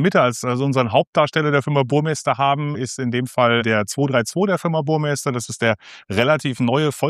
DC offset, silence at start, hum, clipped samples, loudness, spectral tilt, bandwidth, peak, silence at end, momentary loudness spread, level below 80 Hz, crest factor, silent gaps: under 0.1%; 0 s; none; under 0.1%; -19 LUFS; -5.5 dB/octave; 14.5 kHz; 0 dBFS; 0 s; 6 LU; -60 dBFS; 18 dB; 1.07-1.13 s